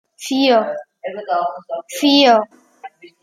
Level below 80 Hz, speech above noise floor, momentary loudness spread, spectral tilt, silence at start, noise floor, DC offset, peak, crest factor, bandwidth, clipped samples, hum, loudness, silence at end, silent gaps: -70 dBFS; 23 dB; 17 LU; -3 dB/octave; 0.2 s; -40 dBFS; under 0.1%; -2 dBFS; 16 dB; 14.5 kHz; under 0.1%; none; -16 LUFS; 0.15 s; none